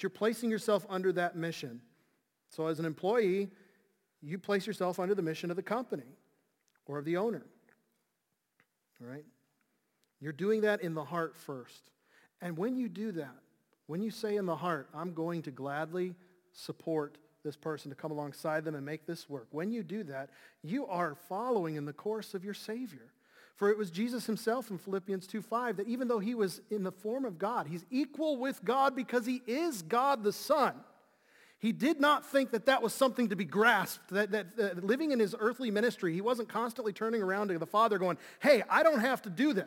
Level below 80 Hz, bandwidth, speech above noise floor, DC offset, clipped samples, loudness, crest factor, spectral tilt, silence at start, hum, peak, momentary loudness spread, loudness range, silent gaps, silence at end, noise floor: -86 dBFS; 17 kHz; 50 dB; under 0.1%; under 0.1%; -33 LUFS; 24 dB; -5.5 dB/octave; 0 s; none; -12 dBFS; 14 LU; 9 LU; none; 0 s; -83 dBFS